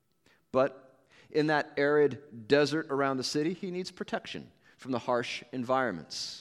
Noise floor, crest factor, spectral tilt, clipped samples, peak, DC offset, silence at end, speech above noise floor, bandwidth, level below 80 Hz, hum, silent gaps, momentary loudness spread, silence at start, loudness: -69 dBFS; 20 dB; -5 dB/octave; under 0.1%; -10 dBFS; under 0.1%; 0 s; 39 dB; 12.5 kHz; -74 dBFS; none; none; 11 LU; 0.55 s; -30 LUFS